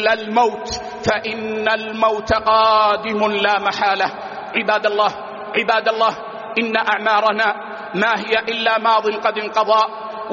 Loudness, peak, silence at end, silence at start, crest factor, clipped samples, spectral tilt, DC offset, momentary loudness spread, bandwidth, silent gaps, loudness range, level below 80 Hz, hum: -18 LUFS; -2 dBFS; 0 s; 0 s; 16 dB; under 0.1%; -1 dB/octave; under 0.1%; 8 LU; 7.2 kHz; none; 2 LU; -50 dBFS; none